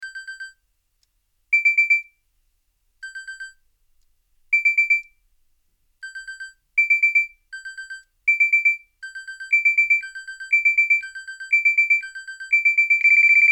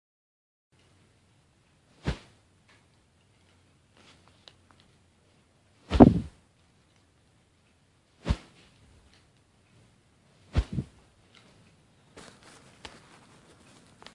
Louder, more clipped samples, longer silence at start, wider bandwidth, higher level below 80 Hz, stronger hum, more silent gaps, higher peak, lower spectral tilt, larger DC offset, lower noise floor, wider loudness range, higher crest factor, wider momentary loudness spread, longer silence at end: first, -17 LUFS vs -26 LUFS; neither; second, 0 s vs 2.05 s; first, 12.5 kHz vs 11 kHz; second, -68 dBFS vs -44 dBFS; neither; neither; second, -8 dBFS vs 0 dBFS; second, 5 dB/octave vs -8 dB/octave; neither; first, -69 dBFS vs -65 dBFS; second, 5 LU vs 18 LU; second, 14 dB vs 32 dB; second, 21 LU vs 32 LU; second, 0 s vs 3.3 s